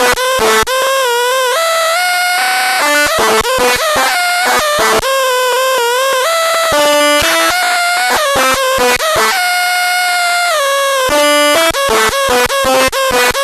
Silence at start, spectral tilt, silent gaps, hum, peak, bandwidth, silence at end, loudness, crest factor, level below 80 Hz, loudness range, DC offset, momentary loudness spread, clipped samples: 0 s; -0.5 dB/octave; none; none; 0 dBFS; 13.5 kHz; 0 s; -10 LUFS; 10 dB; -38 dBFS; 1 LU; under 0.1%; 3 LU; under 0.1%